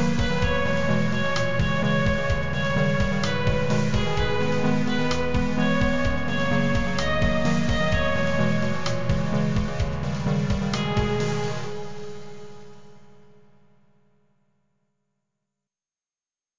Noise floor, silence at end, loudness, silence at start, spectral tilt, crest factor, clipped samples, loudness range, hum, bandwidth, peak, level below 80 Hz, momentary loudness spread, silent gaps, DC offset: under -90 dBFS; 0 s; -24 LUFS; 0 s; -6 dB/octave; 16 dB; under 0.1%; 6 LU; none; 7.6 kHz; -8 dBFS; -36 dBFS; 5 LU; none; 4%